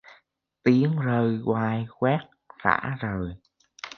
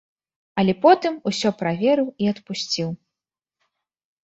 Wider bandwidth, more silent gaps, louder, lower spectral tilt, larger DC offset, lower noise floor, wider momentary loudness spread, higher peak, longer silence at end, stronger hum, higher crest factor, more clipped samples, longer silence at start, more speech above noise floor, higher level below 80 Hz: second, 6.6 kHz vs 8.2 kHz; neither; second, -25 LUFS vs -21 LUFS; first, -8.5 dB/octave vs -5.5 dB/octave; neither; second, -64 dBFS vs -88 dBFS; second, 9 LU vs 12 LU; about the same, -2 dBFS vs -2 dBFS; second, 0.05 s vs 1.3 s; neither; about the same, 24 dB vs 20 dB; neither; second, 0.1 s vs 0.55 s; second, 40 dB vs 68 dB; first, -54 dBFS vs -64 dBFS